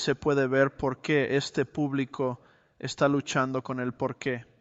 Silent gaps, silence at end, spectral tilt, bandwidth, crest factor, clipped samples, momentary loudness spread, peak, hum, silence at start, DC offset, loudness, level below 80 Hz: none; 0.15 s; -5.5 dB/octave; 8.2 kHz; 18 dB; under 0.1%; 8 LU; -10 dBFS; none; 0 s; under 0.1%; -28 LUFS; -60 dBFS